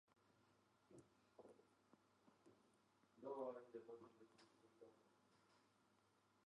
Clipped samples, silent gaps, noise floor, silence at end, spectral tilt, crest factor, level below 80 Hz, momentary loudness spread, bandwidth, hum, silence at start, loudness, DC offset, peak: under 0.1%; none; -81 dBFS; 0.05 s; -6 dB/octave; 22 dB; under -90 dBFS; 17 LU; 9.6 kHz; none; 0.1 s; -56 LUFS; under 0.1%; -40 dBFS